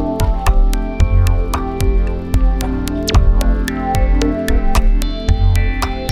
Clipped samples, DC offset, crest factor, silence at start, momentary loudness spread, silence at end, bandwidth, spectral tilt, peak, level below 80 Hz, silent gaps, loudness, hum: under 0.1%; under 0.1%; 12 dB; 0 s; 5 LU; 0 s; 15 kHz; -6 dB/octave; -2 dBFS; -14 dBFS; none; -17 LUFS; none